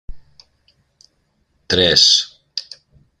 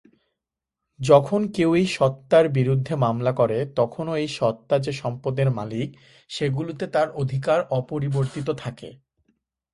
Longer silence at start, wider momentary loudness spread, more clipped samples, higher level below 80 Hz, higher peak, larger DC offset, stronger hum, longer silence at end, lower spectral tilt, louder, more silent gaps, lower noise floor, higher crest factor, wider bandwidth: second, 0.1 s vs 1 s; first, 19 LU vs 12 LU; neither; first, -44 dBFS vs -58 dBFS; about the same, 0 dBFS vs -2 dBFS; neither; neither; second, 0.6 s vs 0.8 s; second, -1.5 dB/octave vs -7 dB/octave; first, -12 LUFS vs -23 LUFS; neither; second, -64 dBFS vs -85 dBFS; about the same, 20 dB vs 22 dB; first, 13.5 kHz vs 11.5 kHz